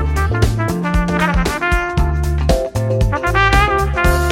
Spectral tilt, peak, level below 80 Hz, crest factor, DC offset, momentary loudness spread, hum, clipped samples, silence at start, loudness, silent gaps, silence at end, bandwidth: -6 dB/octave; 0 dBFS; -20 dBFS; 14 dB; under 0.1%; 5 LU; none; under 0.1%; 0 s; -16 LUFS; none; 0 s; 16.5 kHz